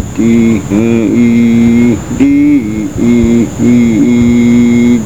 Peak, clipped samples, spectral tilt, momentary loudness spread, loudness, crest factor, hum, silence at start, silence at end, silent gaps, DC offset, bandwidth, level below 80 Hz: 0 dBFS; 0.6%; -7 dB/octave; 4 LU; -8 LUFS; 8 dB; none; 0 s; 0 s; none; 2%; 8.2 kHz; -30 dBFS